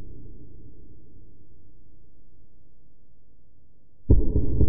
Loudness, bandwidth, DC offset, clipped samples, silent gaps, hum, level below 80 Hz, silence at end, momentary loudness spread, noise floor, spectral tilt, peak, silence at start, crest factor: -24 LUFS; 1.1 kHz; under 0.1%; under 0.1%; none; none; -30 dBFS; 0 s; 28 LU; -58 dBFS; -16.5 dB/octave; -4 dBFS; 0 s; 22 dB